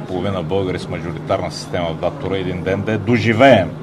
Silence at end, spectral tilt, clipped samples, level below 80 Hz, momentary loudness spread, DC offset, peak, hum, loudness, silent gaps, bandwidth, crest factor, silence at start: 0 s; -6.5 dB/octave; under 0.1%; -46 dBFS; 12 LU; 0.1%; 0 dBFS; none; -18 LUFS; none; 13 kHz; 18 dB; 0 s